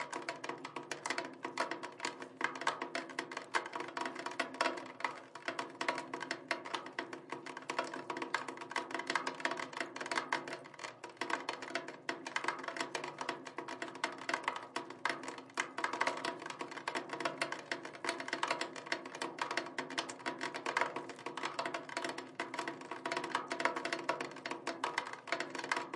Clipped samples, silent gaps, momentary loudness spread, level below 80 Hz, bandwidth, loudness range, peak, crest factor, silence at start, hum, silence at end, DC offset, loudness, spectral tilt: under 0.1%; none; 7 LU; under -90 dBFS; 11.5 kHz; 2 LU; -16 dBFS; 26 dB; 0 s; none; 0 s; under 0.1%; -40 LUFS; -2 dB/octave